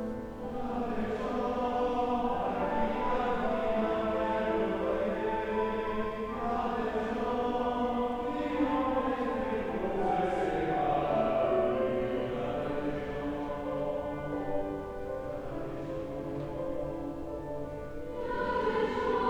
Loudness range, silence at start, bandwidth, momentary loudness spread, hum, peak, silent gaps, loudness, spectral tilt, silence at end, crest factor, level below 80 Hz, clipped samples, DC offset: 6 LU; 0 s; 17.5 kHz; 9 LU; none; -16 dBFS; none; -32 LUFS; -7 dB/octave; 0 s; 14 dB; -48 dBFS; under 0.1%; under 0.1%